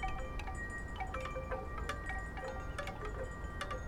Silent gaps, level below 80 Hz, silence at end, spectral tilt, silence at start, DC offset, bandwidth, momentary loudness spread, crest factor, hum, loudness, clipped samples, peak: none; -44 dBFS; 0 s; -5.5 dB/octave; 0 s; under 0.1%; 15.5 kHz; 2 LU; 14 dB; none; -43 LUFS; under 0.1%; -26 dBFS